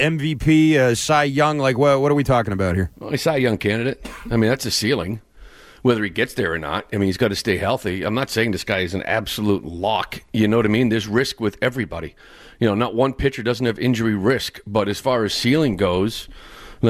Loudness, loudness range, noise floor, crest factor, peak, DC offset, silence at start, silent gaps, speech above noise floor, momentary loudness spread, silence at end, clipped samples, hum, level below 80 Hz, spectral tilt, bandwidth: -20 LUFS; 4 LU; -44 dBFS; 14 dB; -6 dBFS; under 0.1%; 0 s; none; 24 dB; 8 LU; 0 s; under 0.1%; none; -42 dBFS; -5.5 dB/octave; 16 kHz